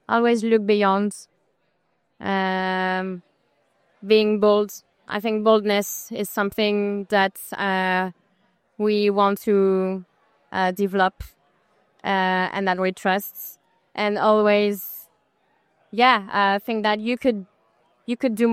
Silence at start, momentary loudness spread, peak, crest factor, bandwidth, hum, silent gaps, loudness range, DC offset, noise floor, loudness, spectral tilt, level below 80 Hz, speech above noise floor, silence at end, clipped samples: 0.1 s; 14 LU; -4 dBFS; 20 dB; 16 kHz; none; none; 3 LU; under 0.1%; -70 dBFS; -21 LUFS; -5 dB/octave; -60 dBFS; 49 dB; 0 s; under 0.1%